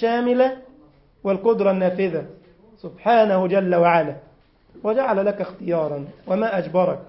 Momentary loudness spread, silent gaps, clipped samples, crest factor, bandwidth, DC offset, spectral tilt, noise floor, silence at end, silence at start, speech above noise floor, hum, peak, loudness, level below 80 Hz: 14 LU; none; under 0.1%; 18 dB; 5.8 kHz; under 0.1%; -11.5 dB/octave; -53 dBFS; 0.05 s; 0 s; 34 dB; none; -4 dBFS; -20 LUFS; -60 dBFS